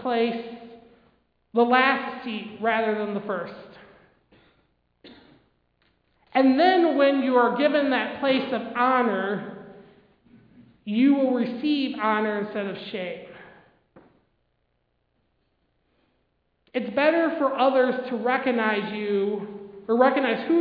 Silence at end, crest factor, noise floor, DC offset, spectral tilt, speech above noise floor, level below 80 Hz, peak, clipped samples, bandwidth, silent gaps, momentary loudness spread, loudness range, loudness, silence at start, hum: 0 s; 20 dB; -72 dBFS; under 0.1%; -8 dB/octave; 49 dB; -70 dBFS; -4 dBFS; under 0.1%; 5.2 kHz; none; 14 LU; 12 LU; -23 LUFS; 0 s; none